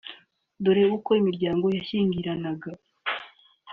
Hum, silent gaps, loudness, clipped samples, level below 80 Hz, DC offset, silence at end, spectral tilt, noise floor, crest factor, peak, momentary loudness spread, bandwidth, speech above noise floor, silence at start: none; none; -25 LUFS; under 0.1%; -62 dBFS; under 0.1%; 0 s; -5.5 dB/octave; -52 dBFS; 16 dB; -10 dBFS; 13 LU; 4.9 kHz; 28 dB; 0.05 s